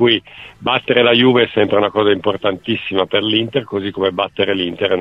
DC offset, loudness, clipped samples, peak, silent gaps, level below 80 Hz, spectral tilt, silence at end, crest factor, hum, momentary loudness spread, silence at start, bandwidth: under 0.1%; -16 LUFS; under 0.1%; 0 dBFS; none; -54 dBFS; -7.5 dB/octave; 0 s; 16 dB; none; 8 LU; 0 s; 5.6 kHz